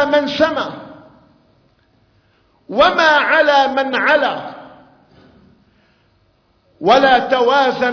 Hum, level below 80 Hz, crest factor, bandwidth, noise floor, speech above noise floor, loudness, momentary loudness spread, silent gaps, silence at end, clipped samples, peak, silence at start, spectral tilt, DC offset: none; -54 dBFS; 16 dB; 5.4 kHz; -58 dBFS; 44 dB; -14 LUFS; 14 LU; none; 0 s; under 0.1%; -2 dBFS; 0 s; -4 dB/octave; under 0.1%